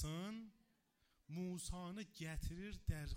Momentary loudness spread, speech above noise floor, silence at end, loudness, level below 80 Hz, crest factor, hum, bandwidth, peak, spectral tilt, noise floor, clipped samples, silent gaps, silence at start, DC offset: 7 LU; 34 dB; 0 s; -49 LUFS; -54 dBFS; 20 dB; none; 16 kHz; -28 dBFS; -5 dB/octave; -80 dBFS; under 0.1%; none; 0 s; under 0.1%